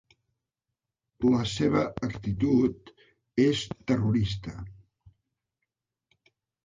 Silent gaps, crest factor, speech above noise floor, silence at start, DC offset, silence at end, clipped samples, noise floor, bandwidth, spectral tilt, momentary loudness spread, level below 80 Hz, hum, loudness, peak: none; 18 dB; 61 dB; 1.2 s; under 0.1%; 1.9 s; under 0.1%; -87 dBFS; 9.4 kHz; -6.5 dB/octave; 14 LU; -52 dBFS; none; -27 LUFS; -12 dBFS